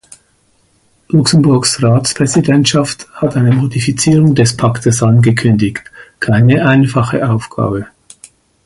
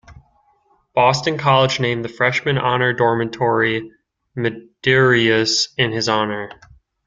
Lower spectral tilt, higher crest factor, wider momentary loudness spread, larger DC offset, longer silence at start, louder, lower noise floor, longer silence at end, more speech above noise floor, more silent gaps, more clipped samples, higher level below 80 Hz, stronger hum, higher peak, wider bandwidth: about the same, -5.5 dB/octave vs -4.5 dB/octave; second, 12 dB vs 18 dB; about the same, 8 LU vs 10 LU; neither; first, 1.1 s vs 0.1 s; first, -11 LUFS vs -17 LUFS; second, -55 dBFS vs -60 dBFS; first, 0.8 s vs 0.55 s; about the same, 45 dB vs 42 dB; neither; neither; first, -42 dBFS vs -54 dBFS; neither; about the same, 0 dBFS vs -2 dBFS; first, 11.5 kHz vs 9.2 kHz